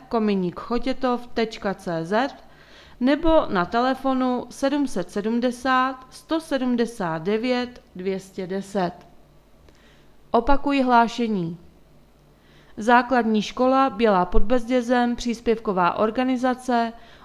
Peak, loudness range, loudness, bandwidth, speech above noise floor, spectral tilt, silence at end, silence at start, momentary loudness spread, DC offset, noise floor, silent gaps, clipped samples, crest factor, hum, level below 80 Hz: -2 dBFS; 5 LU; -23 LUFS; 12.5 kHz; 32 dB; -6 dB/octave; 0.2 s; 0 s; 10 LU; under 0.1%; -54 dBFS; none; under 0.1%; 20 dB; none; -40 dBFS